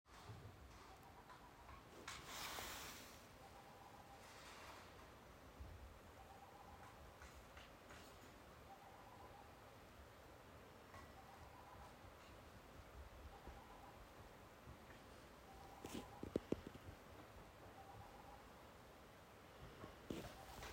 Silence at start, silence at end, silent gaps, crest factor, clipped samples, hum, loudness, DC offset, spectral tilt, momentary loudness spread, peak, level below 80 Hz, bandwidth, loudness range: 0.05 s; 0 s; none; 32 dB; under 0.1%; none; -58 LUFS; under 0.1%; -4 dB/octave; 11 LU; -26 dBFS; -68 dBFS; 16 kHz; 7 LU